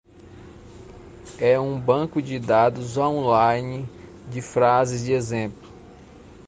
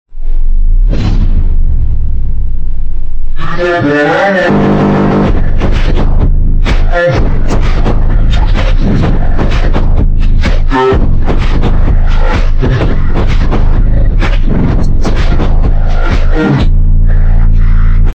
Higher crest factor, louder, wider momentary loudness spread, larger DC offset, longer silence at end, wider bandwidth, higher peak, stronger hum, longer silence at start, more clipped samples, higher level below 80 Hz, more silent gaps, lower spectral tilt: first, 18 dB vs 6 dB; second, -22 LUFS vs -12 LUFS; first, 16 LU vs 7 LU; neither; about the same, 0.15 s vs 0.05 s; first, 9.6 kHz vs 6.2 kHz; second, -4 dBFS vs 0 dBFS; neither; first, 0.25 s vs 0.1 s; neither; second, -52 dBFS vs -8 dBFS; neither; about the same, -6.5 dB/octave vs -7.5 dB/octave